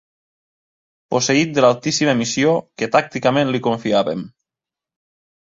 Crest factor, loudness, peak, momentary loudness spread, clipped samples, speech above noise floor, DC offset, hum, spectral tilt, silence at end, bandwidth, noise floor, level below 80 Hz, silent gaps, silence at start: 18 dB; -18 LUFS; -2 dBFS; 7 LU; under 0.1%; 70 dB; under 0.1%; none; -4.5 dB/octave; 1.2 s; 7.8 kHz; -88 dBFS; -60 dBFS; none; 1.1 s